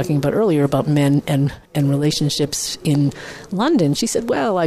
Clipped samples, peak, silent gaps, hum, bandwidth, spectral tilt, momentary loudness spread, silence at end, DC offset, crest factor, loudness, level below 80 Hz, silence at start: under 0.1%; -4 dBFS; none; none; 15 kHz; -5.5 dB/octave; 5 LU; 0 s; under 0.1%; 14 dB; -18 LUFS; -48 dBFS; 0 s